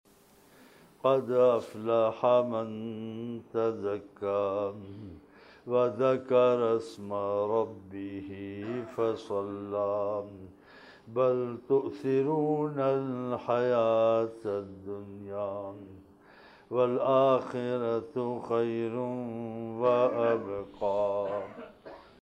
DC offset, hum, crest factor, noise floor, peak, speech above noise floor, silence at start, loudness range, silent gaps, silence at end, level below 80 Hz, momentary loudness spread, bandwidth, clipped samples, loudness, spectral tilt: under 0.1%; none; 18 dB; -60 dBFS; -12 dBFS; 31 dB; 1.05 s; 4 LU; none; 0.2 s; -70 dBFS; 15 LU; 9.8 kHz; under 0.1%; -30 LUFS; -8 dB/octave